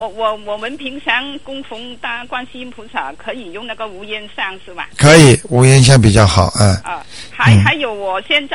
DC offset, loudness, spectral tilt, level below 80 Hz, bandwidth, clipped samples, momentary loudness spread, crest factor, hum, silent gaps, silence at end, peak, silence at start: 2%; -12 LUFS; -5 dB/octave; -34 dBFS; 12 kHz; 0.2%; 20 LU; 14 dB; none; none; 0 s; 0 dBFS; 0 s